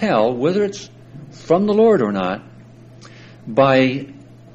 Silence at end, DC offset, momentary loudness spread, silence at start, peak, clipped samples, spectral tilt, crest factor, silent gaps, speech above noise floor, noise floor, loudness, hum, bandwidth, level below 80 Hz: 0.4 s; under 0.1%; 24 LU; 0 s; -2 dBFS; under 0.1%; -6.5 dB/octave; 16 dB; none; 25 dB; -42 dBFS; -17 LUFS; none; 8 kHz; -56 dBFS